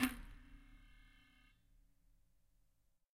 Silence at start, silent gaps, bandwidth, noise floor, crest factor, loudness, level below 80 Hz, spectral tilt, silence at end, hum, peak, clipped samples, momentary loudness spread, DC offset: 0 s; none; 15.5 kHz; -76 dBFS; 30 dB; -46 LUFS; -62 dBFS; -3 dB/octave; 2.05 s; none; -20 dBFS; under 0.1%; 19 LU; under 0.1%